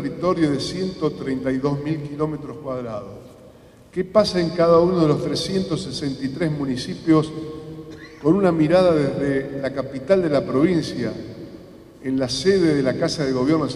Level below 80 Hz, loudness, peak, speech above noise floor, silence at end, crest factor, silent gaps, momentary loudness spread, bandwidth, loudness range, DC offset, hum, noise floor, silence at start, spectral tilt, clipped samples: -48 dBFS; -21 LUFS; -2 dBFS; 26 dB; 0 s; 18 dB; none; 16 LU; 12 kHz; 5 LU; under 0.1%; none; -47 dBFS; 0 s; -6.5 dB/octave; under 0.1%